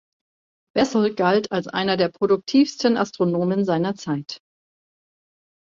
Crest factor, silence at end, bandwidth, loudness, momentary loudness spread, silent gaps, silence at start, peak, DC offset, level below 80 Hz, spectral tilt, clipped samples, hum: 18 dB; 1.3 s; 7.6 kHz; -21 LUFS; 9 LU; none; 0.75 s; -4 dBFS; under 0.1%; -64 dBFS; -6 dB/octave; under 0.1%; none